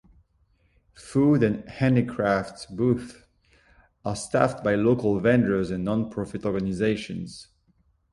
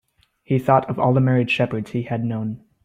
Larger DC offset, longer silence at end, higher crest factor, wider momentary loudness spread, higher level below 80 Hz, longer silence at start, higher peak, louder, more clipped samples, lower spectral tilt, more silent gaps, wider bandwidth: neither; first, 0.7 s vs 0.25 s; about the same, 20 dB vs 18 dB; first, 14 LU vs 9 LU; about the same, -52 dBFS vs -56 dBFS; first, 1 s vs 0.5 s; second, -6 dBFS vs -2 dBFS; second, -25 LUFS vs -21 LUFS; neither; second, -7 dB/octave vs -8.5 dB/octave; neither; first, 11.5 kHz vs 7.6 kHz